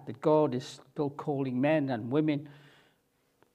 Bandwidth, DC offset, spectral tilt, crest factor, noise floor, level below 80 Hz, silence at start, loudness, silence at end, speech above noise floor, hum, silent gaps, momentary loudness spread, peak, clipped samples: 9.8 kHz; under 0.1%; -7.5 dB/octave; 18 dB; -72 dBFS; -78 dBFS; 0 s; -30 LUFS; 1 s; 43 dB; none; none; 11 LU; -12 dBFS; under 0.1%